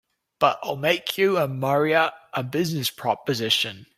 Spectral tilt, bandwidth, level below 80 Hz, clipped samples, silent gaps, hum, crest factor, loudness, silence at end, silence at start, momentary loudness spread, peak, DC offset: -4.5 dB/octave; 16 kHz; -66 dBFS; under 0.1%; none; none; 20 dB; -23 LUFS; 0.15 s; 0.4 s; 5 LU; -4 dBFS; under 0.1%